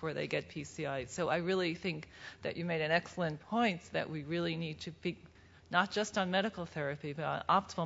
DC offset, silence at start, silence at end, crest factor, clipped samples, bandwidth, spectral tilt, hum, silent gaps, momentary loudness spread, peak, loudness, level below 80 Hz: under 0.1%; 0 s; 0 s; 22 dB; under 0.1%; 7.6 kHz; -3.5 dB/octave; none; none; 10 LU; -14 dBFS; -36 LUFS; -66 dBFS